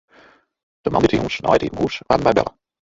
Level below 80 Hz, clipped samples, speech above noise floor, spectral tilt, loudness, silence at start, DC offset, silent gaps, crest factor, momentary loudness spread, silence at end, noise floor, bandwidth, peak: -44 dBFS; under 0.1%; 34 dB; -6 dB/octave; -19 LUFS; 0.85 s; under 0.1%; none; 20 dB; 8 LU; 0.35 s; -52 dBFS; 7.8 kHz; -2 dBFS